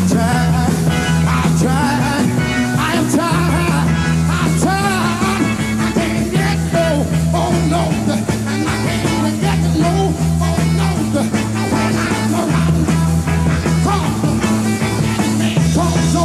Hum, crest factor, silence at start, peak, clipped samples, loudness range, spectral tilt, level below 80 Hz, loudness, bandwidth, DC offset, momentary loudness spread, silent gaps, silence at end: none; 12 dB; 0 s; -2 dBFS; under 0.1%; 1 LU; -5.5 dB/octave; -30 dBFS; -15 LUFS; 14.5 kHz; 0.2%; 2 LU; none; 0 s